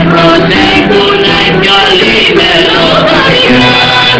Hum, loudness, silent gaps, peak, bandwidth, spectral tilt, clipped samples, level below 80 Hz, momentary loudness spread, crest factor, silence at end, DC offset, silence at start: none; -4 LUFS; none; 0 dBFS; 8 kHz; -5 dB/octave; 5%; -30 dBFS; 2 LU; 6 dB; 0 s; under 0.1%; 0 s